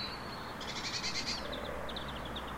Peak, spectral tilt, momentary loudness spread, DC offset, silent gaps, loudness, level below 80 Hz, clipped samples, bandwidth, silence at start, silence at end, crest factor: -24 dBFS; -3 dB/octave; 7 LU; under 0.1%; none; -38 LUFS; -52 dBFS; under 0.1%; 16 kHz; 0 s; 0 s; 16 dB